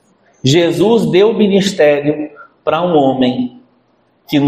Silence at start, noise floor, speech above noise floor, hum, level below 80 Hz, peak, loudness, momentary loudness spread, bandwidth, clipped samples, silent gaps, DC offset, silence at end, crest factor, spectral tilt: 0.45 s; -56 dBFS; 44 dB; none; -54 dBFS; 0 dBFS; -13 LUFS; 11 LU; 15 kHz; under 0.1%; none; under 0.1%; 0 s; 14 dB; -6 dB/octave